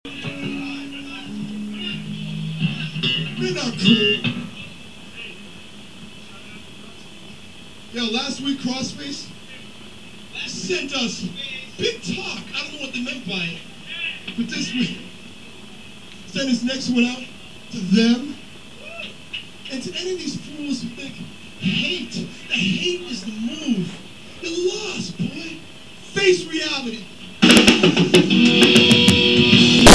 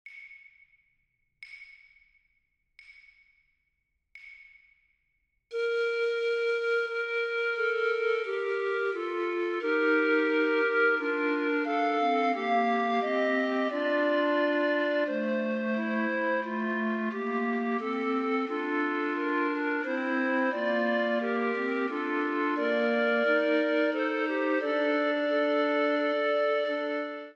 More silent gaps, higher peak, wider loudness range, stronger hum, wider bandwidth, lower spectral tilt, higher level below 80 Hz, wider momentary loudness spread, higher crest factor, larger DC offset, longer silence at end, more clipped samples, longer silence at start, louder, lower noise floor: neither; first, 0 dBFS vs -14 dBFS; first, 12 LU vs 3 LU; neither; first, 11 kHz vs 7.8 kHz; second, -4 dB/octave vs -5.5 dB/octave; first, -42 dBFS vs -84 dBFS; first, 27 LU vs 5 LU; about the same, 20 dB vs 16 dB; first, 0.8% vs under 0.1%; about the same, 0 s vs 0.05 s; neither; about the same, 0.05 s vs 0.05 s; first, -19 LUFS vs -28 LUFS; second, -42 dBFS vs -78 dBFS